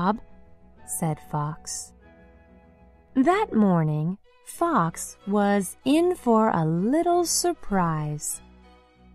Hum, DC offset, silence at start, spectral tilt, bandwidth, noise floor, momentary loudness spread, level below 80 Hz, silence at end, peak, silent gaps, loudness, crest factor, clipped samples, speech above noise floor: none; under 0.1%; 0 s; -5.5 dB/octave; 14 kHz; -54 dBFS; 12 LU; -52 dBFS; 0.75 s; -8 dBFS; none; -24 LUFS; 16 dB; under 0.1%; 30 dB